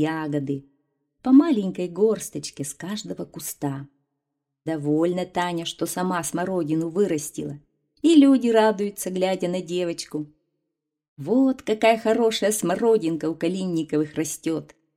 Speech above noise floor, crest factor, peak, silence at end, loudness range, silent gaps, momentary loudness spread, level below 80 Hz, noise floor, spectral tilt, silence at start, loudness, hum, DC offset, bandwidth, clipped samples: 59 dB; 18 dB; -6 dBFS; 0.3 s; 7 LU; 11.08-11.16 s; 15 LU; -64 dBFS; -81 dBFS; -5 dB/octave; 0 s; -23 LUFS; none; under 0.1%; 16 kHz; under 0.1%